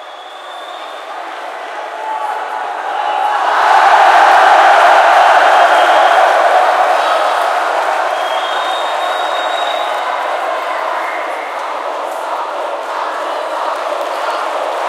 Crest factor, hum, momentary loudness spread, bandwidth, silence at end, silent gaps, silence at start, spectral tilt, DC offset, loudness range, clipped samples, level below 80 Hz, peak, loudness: 12 dB; none; 17 LU; 15.5 kHz; 0 s; none; 0 s; 1 dB/octave; under 0.1%; 11 LU; under 0.1%; -74 dBFS; 0 dBFS; -12 LUFS